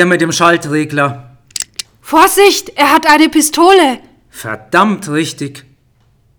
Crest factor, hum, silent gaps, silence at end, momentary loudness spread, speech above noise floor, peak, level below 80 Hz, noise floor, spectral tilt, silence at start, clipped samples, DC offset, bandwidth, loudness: 12 dB; none; none; 0.8 s; 18 LU; 42 dB; 0 dBFS; -48 dBFS; -53 dBFS; -3.5 dB/octave; 0 s; 0.6%; under 0.1%; over 20 kHz; -10 LUFS